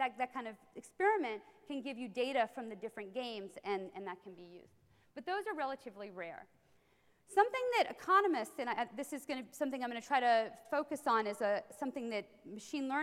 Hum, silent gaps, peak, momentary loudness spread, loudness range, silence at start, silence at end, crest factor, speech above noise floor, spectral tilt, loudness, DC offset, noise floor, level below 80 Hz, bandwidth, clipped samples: none; none; -16 dBFS; 16 LU; 9 LU; 0 s; 0 s; 22 dB; 34 dB; -3.5 dB/octave; -37 LUFS; under 0.1%; -71 dBFS; -84 dBFS; 16 kHz; under 0.1%